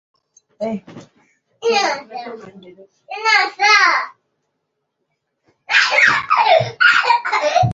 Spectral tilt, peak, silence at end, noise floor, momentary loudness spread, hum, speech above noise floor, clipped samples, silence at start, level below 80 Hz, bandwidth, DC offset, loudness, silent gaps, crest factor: -3 dB/octave; 0 dBFS; 0 s; -74 dBFS; 19 LU; none; 56 dB; under 0.1%; 0.6 s; -54 dBFS; 8 kHz; under 0.1%; -14 LUFS; none; 18 dB